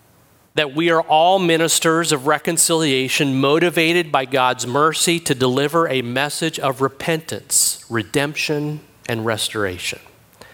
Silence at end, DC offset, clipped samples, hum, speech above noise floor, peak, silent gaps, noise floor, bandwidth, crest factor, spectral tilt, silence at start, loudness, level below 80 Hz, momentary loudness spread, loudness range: 0.55 s; under 0.1%; under 0.1%; none; 35 dB; -2 dBFS; none; -53 dBFS; 17.5 kHz; 18 dB; -3 dB/octave; 0.55 s; -18 LUFS; -60 dBFS; 9 LU; 4 LU